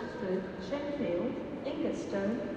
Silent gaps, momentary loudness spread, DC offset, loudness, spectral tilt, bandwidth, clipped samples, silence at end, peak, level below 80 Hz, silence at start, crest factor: none; 4 LU; under 0.1%; -35 LUFS; -6.5 dB/octave; 9.2 kHz; under 0.1%; 0 s; -22 dBFS; -60 dBFS; 0 s; 14 dB